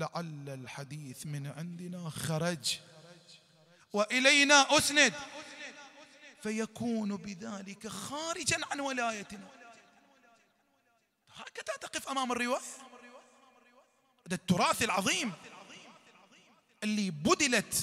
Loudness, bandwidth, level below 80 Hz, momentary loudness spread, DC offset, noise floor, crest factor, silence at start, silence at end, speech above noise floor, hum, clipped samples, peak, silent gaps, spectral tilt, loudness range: -30 LUFS; 16 kHz; -68 dBFS; 22 LU; under 0.1%; -74 dBFS; 26 dB; 0 s; 0 s; 42 dB; none; under 0.1%; -8 dBFS; none; -2.5 dB/octave; 12 LU